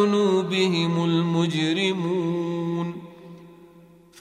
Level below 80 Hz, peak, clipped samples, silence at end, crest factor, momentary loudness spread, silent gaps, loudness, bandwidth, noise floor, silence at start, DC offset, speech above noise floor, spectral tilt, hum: -68 dBFS; -8 dBFS; under 0.1%; 0.65 s; 16 dB; 11 LU; none; -23 LUFS; 10.5 kHz; -51 dBFS; 0 s; under 0.1%; 29 dB; -6 dB/octave; none